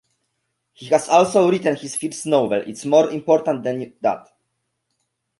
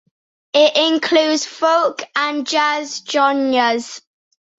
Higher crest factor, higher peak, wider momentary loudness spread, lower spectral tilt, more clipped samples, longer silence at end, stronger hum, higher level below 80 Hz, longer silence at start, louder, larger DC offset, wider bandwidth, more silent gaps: about the same, 18 dB vs 16 dB; about the same, -2 dBFS vs -2 dBFS; about the same, 10 LU vs 8 LU; first, -5 dB/octave vs -1 dB/octave; neither; first, 1.2 s vs 0.6 s; neither; about the same, -66 dBFS vs -68 dBFS; first, 0.8 s vs 0.55 s; second, -19 LUFS vs -16 LUFS; neither; first, 12 kHz vs 8 kHz; neither